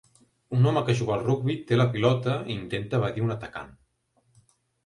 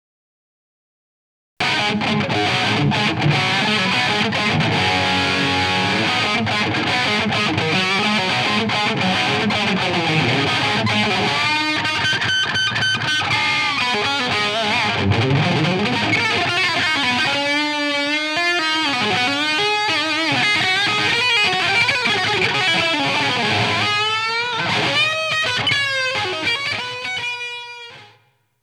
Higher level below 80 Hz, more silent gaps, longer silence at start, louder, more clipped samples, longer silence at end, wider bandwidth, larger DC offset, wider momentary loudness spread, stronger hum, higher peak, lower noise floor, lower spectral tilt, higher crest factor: about the same, -58 dBFS vs -56 dBFS; neither; second, 0.5 s vs 1.6 s; second, -26 LUFS vs -17 LUFS; neither; first, 1.15 s vs 0.55 s; second, 11 kHz vs 15.5 kHz; neither; first, 11 LU vs 3 LU; neither; second, -8 dBFS vs -4 dBFS; first, -69 dBFS vs -58 dBFS; first, -7.5 dB/octave vs -3.5 dB/octave; about the same, 20 dB vs 16 dB